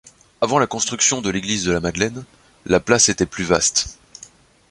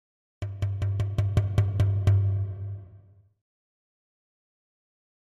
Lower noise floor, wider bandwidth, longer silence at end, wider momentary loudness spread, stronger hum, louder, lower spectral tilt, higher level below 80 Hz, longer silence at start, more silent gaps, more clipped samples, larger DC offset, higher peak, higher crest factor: second, -47 dBFS vs -54 dBFS; first, 11.5 kHz vs 6.2 kHz; second, 0.75 s vs 2.35 s; second, 11 LU vs 15 LU; neither; first, -18 LUFS vs -27 LUFS; second, -2.5 dB/octave vs -8 dB/octave; about the same, -44 dBFS vs -44 dBFS; about the same, 0.4 s vs 0.4 s; neither; neither; neither; first, -2 dBFS vs -10 dBFS; about the same, 20 dB vs 18 dB